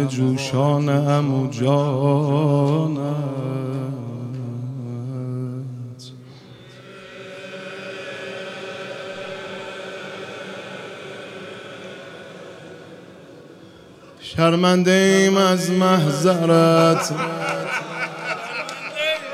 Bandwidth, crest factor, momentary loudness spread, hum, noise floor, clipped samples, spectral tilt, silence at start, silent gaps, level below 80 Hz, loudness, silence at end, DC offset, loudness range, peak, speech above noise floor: 15 kHz; 20 dB; 22 LU; none; -45 dBFS; under 0.1%; -6 dB/octave; 0 s; none; -66 dBFS; -20 LUFS; 0 s; under 0.1%; 18 LU; -2 dBFS; 27 dB